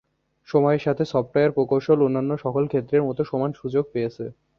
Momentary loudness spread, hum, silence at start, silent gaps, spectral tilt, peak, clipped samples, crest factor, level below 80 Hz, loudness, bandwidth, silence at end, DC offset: 7 LU; none; 0.5 s; none; -9 dB/octave; -6 dBFS; under 0.1%; 18 dB; -60 dBFS; -23 LUFS; 6.6 kHz; 0.25 s; under 0.1%